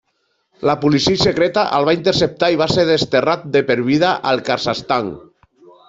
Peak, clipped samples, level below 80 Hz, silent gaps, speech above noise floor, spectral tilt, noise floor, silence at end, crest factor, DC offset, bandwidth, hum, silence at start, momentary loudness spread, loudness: -2 dBFS; under 0.1%; -48 dBFS; none; 51 dB; -5 dB/octave; -67 dBFS; 0.7 s; 14 dB; under 0.1%; 8 kHz; none; 0.6 s; 5 LU; -16 LUFS